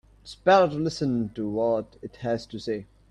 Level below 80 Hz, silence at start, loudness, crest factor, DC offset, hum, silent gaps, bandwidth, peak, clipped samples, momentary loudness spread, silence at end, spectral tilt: -56 dBFS; 0.25 s; -26 LUFS; 18 dB; under 0.1%; none; none; 10.5 kHz; -8 dBFS; under 0.1%; 15 LU; 0.25 s; -6.5 dB/octave